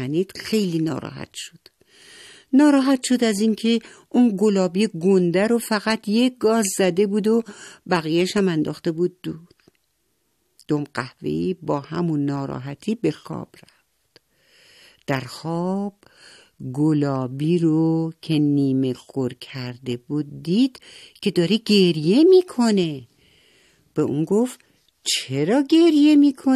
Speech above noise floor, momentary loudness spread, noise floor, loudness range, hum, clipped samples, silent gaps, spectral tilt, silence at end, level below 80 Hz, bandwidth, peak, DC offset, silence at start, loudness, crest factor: 50 dB; 15 LU; -70 dBFS; 9 LU; none; under 0.1%; none; -5.5 dB/octave; 0 s; -64 dBFS; 13.5 kHz; -4 dBFS; under 0.1%; 0 s; -21 LUFS; 16 dB